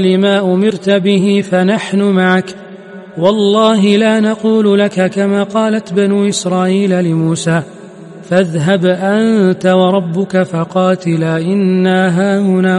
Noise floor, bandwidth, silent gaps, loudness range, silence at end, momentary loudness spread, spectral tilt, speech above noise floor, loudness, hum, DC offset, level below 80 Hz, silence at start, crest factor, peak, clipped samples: -32 dBFS; 11.5 kHz; none; 2 LU; 0 s; 5 LU; -6 dB/octave; 21 dB; -12 LUFS; none; under 0.1%; -58 dBFS; 0 s; 12 dB; 0 dBFS; under 0.1%